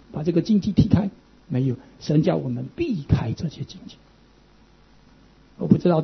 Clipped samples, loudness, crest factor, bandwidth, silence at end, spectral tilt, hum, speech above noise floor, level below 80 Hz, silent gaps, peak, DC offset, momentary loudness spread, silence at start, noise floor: under 0.1%; -23 LUFS; 22 dB; 6.4 kHz; 0 s; -8.5 dB/octave; none; 32 dB; -44 dBFS; none; -2 dBFS; under 0.1%; 13 LU; 0.15 s; -54 dBFS